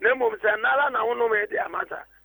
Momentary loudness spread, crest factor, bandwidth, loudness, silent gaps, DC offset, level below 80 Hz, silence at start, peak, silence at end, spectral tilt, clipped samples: 8 LU; 16 dB; over 20 kHz; -24 LUFS; none; under 0.1%; -64 dBFS; 0 s; -8 dBFS; 0.2 s; -5.5 dB/octave; under 0.1%